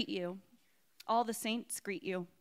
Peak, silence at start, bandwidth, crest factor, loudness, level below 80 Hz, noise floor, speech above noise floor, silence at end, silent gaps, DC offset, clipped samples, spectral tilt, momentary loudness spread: -20 dBFS; 0 s; 16 kHz; 20 dB; -37 LUFS; -88 dBFS; -71 dBFS; 34 dB; 0.15 s; none; under 0.1%; under 0.1%; -3.5 dB/octave; 12 LU